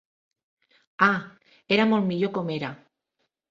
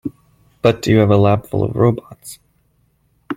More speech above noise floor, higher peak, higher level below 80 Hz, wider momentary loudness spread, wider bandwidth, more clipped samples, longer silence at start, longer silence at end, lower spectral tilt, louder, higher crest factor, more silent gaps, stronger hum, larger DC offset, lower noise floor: first, 54 dB vs 45 dB; second, -6 dBFS vs -2 dBFS; second, -68 dBFS vs -46 dBFS; second, 10 LU vs 22 LU; second, 7.4 kHz vs 15.5 kHz; neither; first, 1 s vs 0.05 s; first, 0.75 s vs 0 s; about the same, -7 dB/octave vs -7.5 dB/octave; second, -24 LUFS vs -15 LUFS; first, 22 dB vs 16 dB; neither; neither; neither; first, -78 dBFS vs -60 dBFS